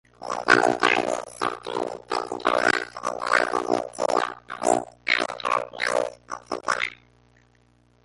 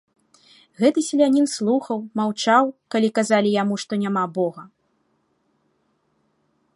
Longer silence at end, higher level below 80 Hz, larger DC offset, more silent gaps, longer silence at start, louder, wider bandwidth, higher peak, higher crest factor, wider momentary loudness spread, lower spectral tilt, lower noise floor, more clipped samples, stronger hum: second, 1.1 s vs 2.1 s; first, -62 dBFS vs -72 dBFS; neither; neither; second, 0.2 s vs 0.8 s; second, -24 LUFS vs -21 LUFS; about the same, 11.5 kHz vs 11.5 kHz; about the same, -2 dBFS vs -2 dBFS; about the same, 24 dB vs 20 dB; first, 11 LU vs 7 LU; second, -2.5 dB/octave vs -5 dB/octave; second, -61 dBFS vs -68 dBFS; neither; first, 60 Hz at -55 dBFS vs none